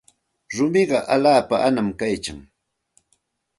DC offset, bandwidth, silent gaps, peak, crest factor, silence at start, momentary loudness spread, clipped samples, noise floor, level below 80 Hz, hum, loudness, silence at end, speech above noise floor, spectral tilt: under 0.1%; 11.5 kHz; none; -4 dBFS; 18 dB; 0.5 s; 11 LU; under 0.1%; -69 dBFS; -54 dBFS; none; -20 LUFS; 1.15 s; 49 dB; -5 dB/octave